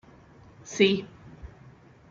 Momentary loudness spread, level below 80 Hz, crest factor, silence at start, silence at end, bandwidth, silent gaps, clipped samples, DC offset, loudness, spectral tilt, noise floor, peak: 25 LU; -56 dBFS; 22 dB; 0.65 s; 0.65 s; 7.6 kHz; none; under 0.1%; under 0.1%; -25 LUFS; -4.5 dB/octave; -53 dBFS; -8 dBFS